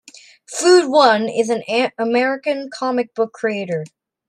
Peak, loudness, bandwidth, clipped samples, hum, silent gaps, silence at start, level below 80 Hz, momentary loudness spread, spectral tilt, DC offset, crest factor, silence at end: -2 dBFS; -17 LUFS; 11.5 kHz; under 0.1%; none; none; 0.5 s; -70 dBFS; 12 LU; -3.5 dB/octave; under 0.1%; 16 dB; 0.4 s